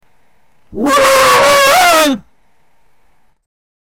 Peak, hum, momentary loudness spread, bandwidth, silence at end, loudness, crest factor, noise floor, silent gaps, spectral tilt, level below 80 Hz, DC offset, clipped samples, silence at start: -2 dBFS; none; 13 LU; over 20 kHz; 1.8 s; -8 LUFS; 12 dB; -58 dBFS; none; -1.5 dB/octave; -44 dBFS; under 0.1%; under 0.1%; 0.7 s